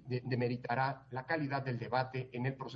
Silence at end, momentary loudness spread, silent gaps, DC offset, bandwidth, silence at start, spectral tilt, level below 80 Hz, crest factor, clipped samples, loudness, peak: 0 s; 4 LU; none; under 0.1%; 5.8 kHz; 0 s; -5.5 dB/octave; -72 dBFS; 18 dB; under 0.1%; -37 LUFS; -18 dBFS